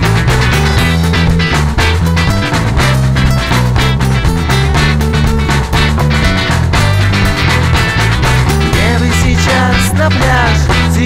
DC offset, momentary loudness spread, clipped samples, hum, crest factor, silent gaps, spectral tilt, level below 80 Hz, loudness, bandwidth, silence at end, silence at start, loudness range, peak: under 0.1%; 2 LU; under 0.1%; none; 10 dB; none; -5 dB/octave; -16 dBFS; -10 LUFS; 16 kHz; 0 s; 0 s; 1 LU; 0 dBFS